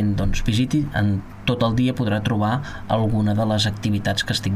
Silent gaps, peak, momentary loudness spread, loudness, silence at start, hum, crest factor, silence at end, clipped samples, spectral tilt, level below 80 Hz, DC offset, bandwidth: none; -6 dBFS; 4 LU; -21 LUFS; 0 s; none; 16 dB; 0 s; under 0.1%; -6 dB/octave; -34 dBFS; under 0.1%; 15 kHz